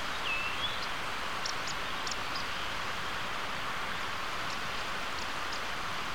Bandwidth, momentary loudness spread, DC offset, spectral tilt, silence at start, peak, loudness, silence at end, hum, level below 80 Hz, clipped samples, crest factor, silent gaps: 18 kHz; 3 LU; 1%; -2 dB/octave; 0 s; -20 dBFS; -34 LUFS; 0 s; none; -54 dBFS; under 0.1%; 14 dB; none